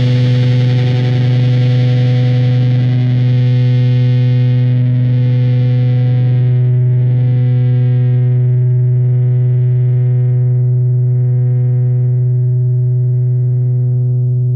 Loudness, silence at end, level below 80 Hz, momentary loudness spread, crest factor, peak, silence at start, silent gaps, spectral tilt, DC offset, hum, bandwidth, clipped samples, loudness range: -12 LUFS; 0 s; -46 dBFS; 2 LU; 8 dB; -4 dBFS; 0 s; none; -9.5 dB/octave; under 0.1%; none; 5 kHz; under 0.1%; 1 LU